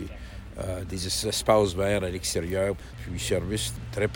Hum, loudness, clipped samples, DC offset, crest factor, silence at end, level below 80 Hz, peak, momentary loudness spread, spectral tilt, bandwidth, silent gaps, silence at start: none; -27 LUFS; under 0.1%; under 0.1%; 20 dB; 0 s; -42 dBFS; -8 dBFS; 14 LU; -4 dB/octave; 17 kHz; none; 0 s